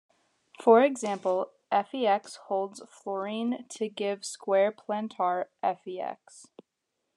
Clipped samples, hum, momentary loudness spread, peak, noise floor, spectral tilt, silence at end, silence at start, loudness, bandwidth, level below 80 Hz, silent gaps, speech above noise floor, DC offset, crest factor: under 0.1%; none; 15 LU; -8 dBFS; -82 dBFS; -4.5 dB/octave; 0.75 s; 0.6 s; -29 LUFS; 11.5 kHz; under -90 dBFS; none; 54 dB; under 0.1%; 22 dB